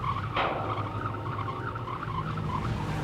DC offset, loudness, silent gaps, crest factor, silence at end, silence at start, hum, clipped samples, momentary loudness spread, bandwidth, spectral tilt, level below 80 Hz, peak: under 0.1%; -32 LUFS; none; 16 dB; 0 s; 0 s; none; under 0.1%; 5 LU; 12 kHz; -7 dB/octave; -46 dBFS; -16 dBFS